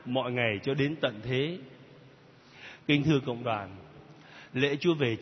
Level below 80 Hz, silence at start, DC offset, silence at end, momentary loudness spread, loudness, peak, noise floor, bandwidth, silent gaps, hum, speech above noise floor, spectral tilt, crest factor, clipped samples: -64 dBFS; 0 s; under 0.1%; 0 s; 22 LU; -29 LUFS; -10 dBFS; -55 dBFS; 6.4 kHz; none; none; 27 dB; -7 dB/octave; 20 dB; under 0.1%